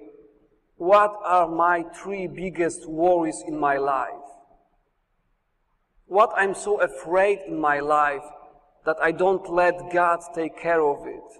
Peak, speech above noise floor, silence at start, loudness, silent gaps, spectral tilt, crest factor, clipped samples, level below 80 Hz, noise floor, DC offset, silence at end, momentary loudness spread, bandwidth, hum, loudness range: -6 dBFS; 48 dB; 0 s; -23 LUFS; none; -5 dB/octave; 18 dB; under 0.1%; -58 dBFS; -70 dBFS; under 0.1%; 0.1 s; 11 LU; 11.5 kHz; none; 4 LU